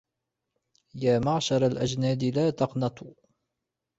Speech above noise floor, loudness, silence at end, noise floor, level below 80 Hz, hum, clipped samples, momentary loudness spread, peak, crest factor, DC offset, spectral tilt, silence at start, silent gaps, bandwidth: 59 dB; -26 LUFS; 0.9 s; -85 dBFS; -58 dBFS; none; under 0.1%; 7 LU; -10 dBFS; 18 dB; under 0.1%; -6 dB/octave; 0.95 s; none; 8 kHz